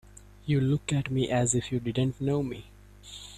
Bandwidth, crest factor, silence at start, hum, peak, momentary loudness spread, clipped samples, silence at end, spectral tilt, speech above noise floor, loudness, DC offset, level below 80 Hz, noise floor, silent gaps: 13.5 kHz; 18 dB; 0.25 s; 50 Hz at -45 dBFS; -12 dBFS; 16 LU; under 0.1%; 0 s; -5.5 dB/octave; 20 dB; -28 LUFS; under 0.1%; -52 dBFS; -48 dBFS; none